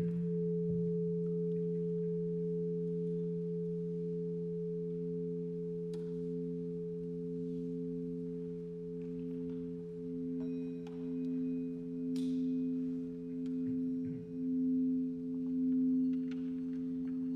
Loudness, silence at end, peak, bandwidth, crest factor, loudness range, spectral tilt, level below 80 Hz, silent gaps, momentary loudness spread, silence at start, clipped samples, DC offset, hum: -38 LUFS; 0 s; -26 dBFS; 5.8 kHz; 10 dB; 6 LU; -11 dB/octave; -68 dBFS; none; 7 LU; 0 s; under 0.1%; under 0.1%; none